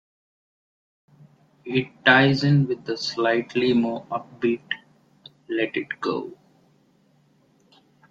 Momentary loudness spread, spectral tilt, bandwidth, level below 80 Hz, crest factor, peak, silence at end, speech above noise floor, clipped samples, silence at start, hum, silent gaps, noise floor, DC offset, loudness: 15 LU; -6.5 dB/octave; 7.6 kHz; -64 dBFS; 24 dB; -2 dBFS; 1.8 s; 39 dB; under 0.1%; 1.65 s; none; none; -61 dBFS; under 0.1%; -23 LUFS